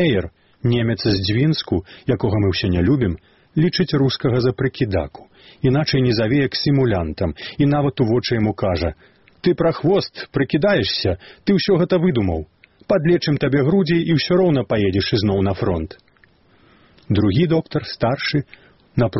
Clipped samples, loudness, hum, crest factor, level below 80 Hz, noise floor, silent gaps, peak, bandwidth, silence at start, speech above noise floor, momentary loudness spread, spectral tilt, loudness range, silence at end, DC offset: under 0.1%; -19 LUFS; none; 14 dB; -42 dBFS; -55 dBFS; none; -4 dBFS; 6 kHz; 0 s; 37 dB; 8 LU; -5.5 dB/octave; 3 LU; 0 s; 0.2%